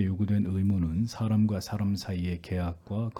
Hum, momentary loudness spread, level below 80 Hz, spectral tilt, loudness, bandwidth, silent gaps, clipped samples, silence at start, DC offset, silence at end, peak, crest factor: none; 6 LU; -52 dBFS; -7.5 dB/octave; -29 LUFS; 13.5 kHz; none; under 0.1%; 0 s; under 0.1%; 0 s; -16 dBFS; 14 dB